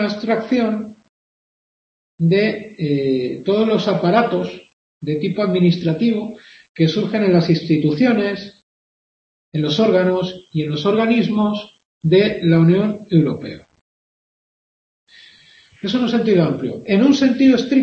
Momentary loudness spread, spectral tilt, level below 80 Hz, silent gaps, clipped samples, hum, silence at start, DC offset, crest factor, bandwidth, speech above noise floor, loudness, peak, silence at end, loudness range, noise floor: 11 LU; -7.5 dB/octave; -58 dBFS; 1.09-2.18 s, 4.73-5.01 s, 6.69-6.75 s, 8.63-9.52 s, 11.85-12.01 s, 13.81-15.07 s; under 0.1%; none; 0 s; under 0.1%; 16 dB; 7 kHz; 33 dB; -17 LUFS; -2 dBFS; 0 s; 4 LU; -49 dBFS